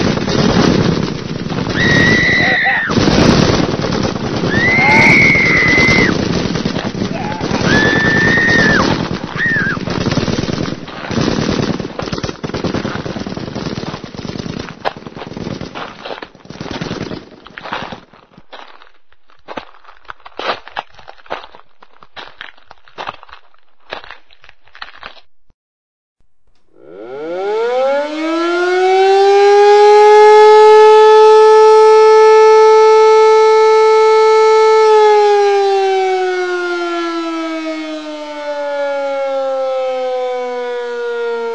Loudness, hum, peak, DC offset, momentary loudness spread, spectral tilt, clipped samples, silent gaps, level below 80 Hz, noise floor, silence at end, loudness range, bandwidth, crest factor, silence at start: -11 LUFS; none; 0 dBFS; under 0.1%; 21 LU; -5 dB/octave; 0.4%; 25.54-26.16 s; -38 dBFS; -57 dBFS; 0 s; 22 LU; 9 kHz; 12 dB; 0 s